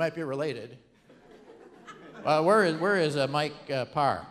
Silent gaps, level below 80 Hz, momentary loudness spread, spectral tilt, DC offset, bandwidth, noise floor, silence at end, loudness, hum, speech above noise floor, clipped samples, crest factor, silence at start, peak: none; -68 dBFS; 24 LU; -5.5 dB/octave; under 0.1%; 13 kHz; -55 dBFS; 0 s; -27 LUFS; none; 28 dB; under 0.1%; 20 dB; 0 s; -10 dBFS